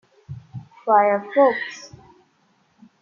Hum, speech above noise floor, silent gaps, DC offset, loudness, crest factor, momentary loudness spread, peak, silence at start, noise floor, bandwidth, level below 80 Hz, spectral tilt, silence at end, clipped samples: none; 45 dB; none; under 0.1%; -19 LUFS; 20 dB; 23 LU; -4 dBFS; 0.3 s; -63 dBFS; 7 kHz; -68 dBFS; -6 dB/octave; 1.15 s; under 0.1%